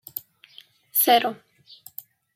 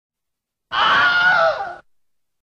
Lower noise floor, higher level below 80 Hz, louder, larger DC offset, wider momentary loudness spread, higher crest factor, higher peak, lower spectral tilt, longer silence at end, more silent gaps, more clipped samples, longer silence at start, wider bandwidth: second, -52 dBFS vs -80 dBFS; second, -80 dBFS vs -58 dBFS; second, -20 LUFS vs -15 LUFS; neither; first, 23 LU vs 13 LU; first, 20 dB vs 14 dB; about the same, -6 dBFS vs -6 dBFS; second, -1 dB/octave vs -2.5 dB/octave; first, 1 s vs 0.65 s; neither; neither; second, 0.15 s vs 0.7 s; first, 16.5 kHz vs 8.4 kHz